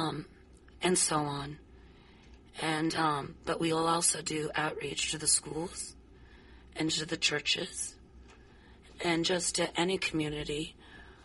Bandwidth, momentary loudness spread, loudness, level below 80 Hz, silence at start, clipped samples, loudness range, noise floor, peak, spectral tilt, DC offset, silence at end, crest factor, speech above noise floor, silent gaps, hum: 11.5 kHz; 13 LU; -31 LUFS; -58 dBFS; 0 s; under 0.1%; 3 LU; -56 dBFS; -14 dBFS; -2.5 dB/octave; under 0.1%; 0 s; 20 dB; 24 dB; none; none